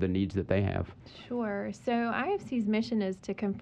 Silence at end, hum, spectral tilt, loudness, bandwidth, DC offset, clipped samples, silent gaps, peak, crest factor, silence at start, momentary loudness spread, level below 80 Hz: 0 s; none; -7.5 dB/octave; -32 LUFS; 8.8 kHz; under 0.1%; under 0.1%; none; -12 dBFS; 18 dB; 0 s; 7 LU; -56 dBFS